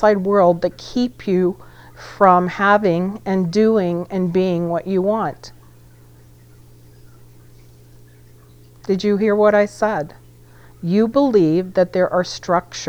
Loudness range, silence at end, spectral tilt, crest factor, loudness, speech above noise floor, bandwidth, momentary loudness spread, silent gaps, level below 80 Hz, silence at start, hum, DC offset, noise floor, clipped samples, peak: 9 LU; 0 s; -6.5 dB/octave; 18 dB; -17 LUFS; 28 dB; 15 kHz; 9 LU; none; -50 dBFS; 0 s; 60 Hz at -45 dBFS; under 0.1%; -45 dBFS; under 0.1%; 0 dBFS